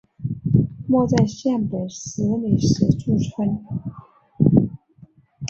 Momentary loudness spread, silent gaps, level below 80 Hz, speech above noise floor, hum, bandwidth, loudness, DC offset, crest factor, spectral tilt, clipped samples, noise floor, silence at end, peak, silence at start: 12 LU; none; -44 dBFS; 30 dB; none; 7.8 kHz; -21 LUFS; under 0.1%; 20 dB; -7.5 dB/octave; under 0.1%; -50 dBFS; 0 s; -2 dBFS; 0.2 s